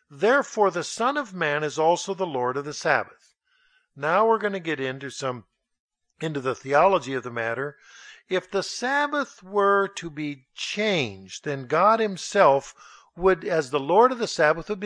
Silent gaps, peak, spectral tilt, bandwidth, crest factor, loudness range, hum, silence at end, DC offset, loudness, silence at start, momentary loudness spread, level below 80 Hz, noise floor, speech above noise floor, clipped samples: 5.80-5.89 s; -4 dBFS; -4 dB/octave; 10.5 kHz; 20 dB; 5 LU; none; 0 s; under 0.1%; -24 LUFS; 0.1 s; 12 LU; -58 dBFS; -65 dBFS; 41 dB; under 0.1%